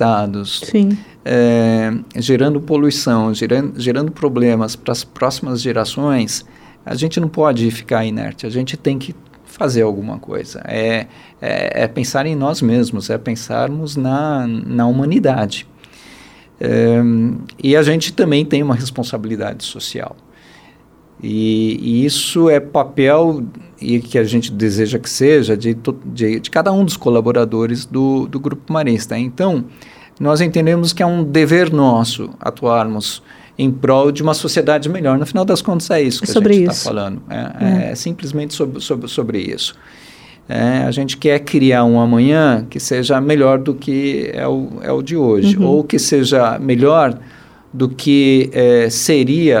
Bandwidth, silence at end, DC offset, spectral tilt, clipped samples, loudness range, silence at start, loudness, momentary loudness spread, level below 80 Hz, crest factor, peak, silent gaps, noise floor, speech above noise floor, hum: 17 kHz; 0 s; under 0.1%; -5.5 dB/octave; under 0.1%; 6 LU; 0 s; -15 LUFS; 11 LU; -52 dBFS; 14 dB; 0 dBFS; none; -47 dBFS; 32 dB; none